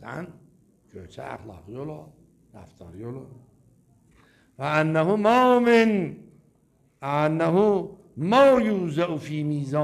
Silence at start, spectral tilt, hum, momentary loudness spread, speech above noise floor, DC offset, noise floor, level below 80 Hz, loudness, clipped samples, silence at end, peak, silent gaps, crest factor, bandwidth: 0 s; -7 dB/octave; none; 22 LU; 40 dB; under 0.1%; -63 dBFS; -60 dBFS; -22 LUFS; under 0.1%; 0 s; -6 dBFS; none; 20 dB; 14 kHz